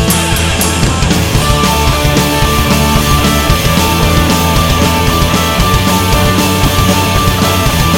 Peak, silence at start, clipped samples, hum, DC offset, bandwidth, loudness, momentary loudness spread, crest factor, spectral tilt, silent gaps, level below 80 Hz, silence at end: 0 dBFS; 0 s; under 0.1%; none; under 0.1%; 17.5 kHz; -10 LUFS; 1 LU; 10 dB; -4 dB/octave; none; -18 dBFS; 0 s